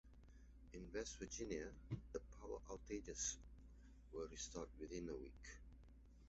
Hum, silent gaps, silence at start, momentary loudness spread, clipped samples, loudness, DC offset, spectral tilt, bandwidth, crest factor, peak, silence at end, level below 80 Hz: none; none; 0.05 s; 20 LU; under 0.1%; -51 LUFS; under 0.1%; -5 dB/octave; 8 kHz; 20 dB; -32 dBFS; 0 s; -62 dBFS